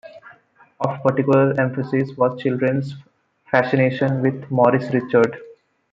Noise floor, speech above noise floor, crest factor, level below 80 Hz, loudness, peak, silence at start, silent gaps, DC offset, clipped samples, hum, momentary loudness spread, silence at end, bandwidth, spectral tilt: -52 dBFS; 33 dB; 18 dB; -62 dBFS; -19 LUFS; -2 dBFS; 0.05 s; none; under 0.1%; under 0.1%; none; 8 LU; 0.4 s; 7.6 kHz; -9 dB/octave